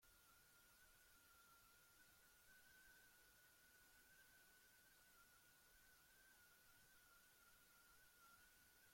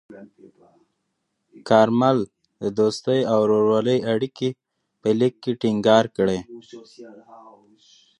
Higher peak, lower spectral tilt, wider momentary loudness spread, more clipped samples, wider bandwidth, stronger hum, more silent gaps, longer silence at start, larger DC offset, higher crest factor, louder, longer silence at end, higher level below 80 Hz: second, -58 dBFS vs -2 dBFS; second, -1 dB/octave vs -6.5 dB/octave; second, 1 LU vs 13 LU; neither; first, 16.5 kHz vs 11 kHz; neither; neither; about the same, 0 s vs 0.1 s; neither; second, 14 dB vs 20 dB; second, -69 LUFS vs -21 LUFS; second, 0 s vs 0.85 s; second, -86 dBFS vs -62 dBFS